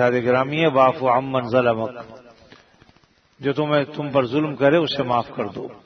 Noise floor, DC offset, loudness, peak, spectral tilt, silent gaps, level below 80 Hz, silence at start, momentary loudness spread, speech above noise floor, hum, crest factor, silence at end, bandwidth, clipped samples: -57 dBFS; under 0.1%; -20 LUFS; -4 dBFS; -7.5 dB/octave; none; -60 dBFS; 0 s; 12 LU; 37 dB; none; 18 dB; 0.1 s; 6.4 kHz; under 0.1%